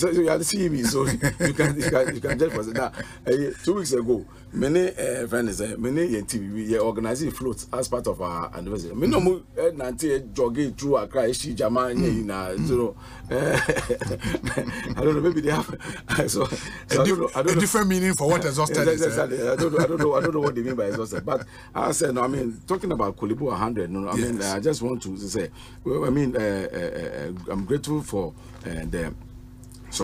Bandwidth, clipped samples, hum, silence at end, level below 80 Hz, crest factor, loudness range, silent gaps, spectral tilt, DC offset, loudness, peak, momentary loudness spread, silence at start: 15.5 kHz; under 0.1%; none; 0 s; -44 dBFS; 18 dB; 5 LU; none; -5 dB/octave; under 0.1%; -25 LUFS; -8 dBFS; 9 LU; 0 s